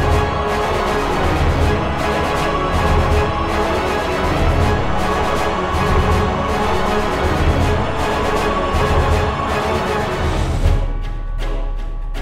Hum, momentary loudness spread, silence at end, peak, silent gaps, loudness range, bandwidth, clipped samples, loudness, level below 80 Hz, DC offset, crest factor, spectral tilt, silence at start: none; 4 LU; 0 s; -4 dBFS; none; 1 LU; 15.5 kHz; under 0.1%; -18 LUFS; -22 dBFS; under 0.1%; 14 dB; -6 dB/octave; 0 s